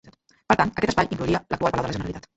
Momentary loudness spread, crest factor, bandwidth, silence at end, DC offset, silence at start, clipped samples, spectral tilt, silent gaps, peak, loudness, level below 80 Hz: 6 LU; 22 dB; 8.2 kHz; 0.15 s; under 0.1%; 0.05 s; under 0.1%; -6 dB/octave; none; -2 dBFS; -24 LUFS; -44 dBFS